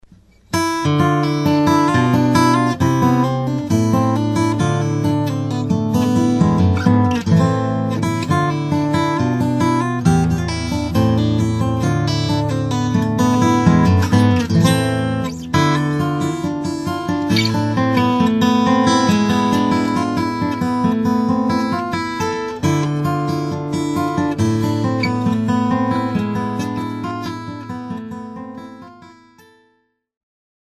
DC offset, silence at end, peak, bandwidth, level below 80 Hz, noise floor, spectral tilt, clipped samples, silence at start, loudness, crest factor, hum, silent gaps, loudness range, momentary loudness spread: under 0.1%; 1.8 s; 0 dBFS; 14 kHz; -42 dBFS; -63 dBFS; -6.5 dB/octave; under 0.1%; 0.5 s; -17 LUFS; 16 dB; none; none; 5 LU; 8 LU